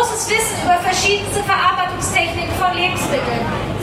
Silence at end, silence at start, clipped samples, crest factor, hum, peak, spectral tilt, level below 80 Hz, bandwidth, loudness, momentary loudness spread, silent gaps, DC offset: 0 s; 0 s; under 0.1%; 14 dB; none; -4 dBFS; -3 dB/octave; -36 dBFS; 16 kHz; -17 LUFS; 4 LU; none; under 0.1%